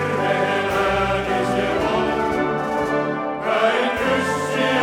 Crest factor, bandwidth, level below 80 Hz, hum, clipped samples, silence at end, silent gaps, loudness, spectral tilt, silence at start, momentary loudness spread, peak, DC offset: 14 dB; 18 kHz; -42 dBFS; none; under 0.1%; 0 s; none; -20 LUFS; -5 dB/octave; 0 s; 3 LU; -6 dBFS; under 0.1%